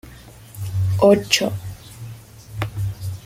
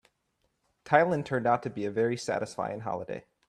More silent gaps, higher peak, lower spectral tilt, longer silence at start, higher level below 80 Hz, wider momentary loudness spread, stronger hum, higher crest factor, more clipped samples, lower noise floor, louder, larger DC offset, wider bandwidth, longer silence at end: neither; first, -2 dBFS vs -6 dBFS; about the same, -5 dB/octave vs -6 dB/octave; second, 0.05 s vs 0.85 s; first, -46 dBFS vs -68 dBFS; first, 22 LU vs 11 LU; neither; about the same, 20 dB vs 24 dB; neither; second, -42 dBFS vs -76 dBFS; first, -20 LUFS vs -29 LUFS; neither; first, 16.5 kHz vs 12.5 kHz; second, 0 s vs 0.3 s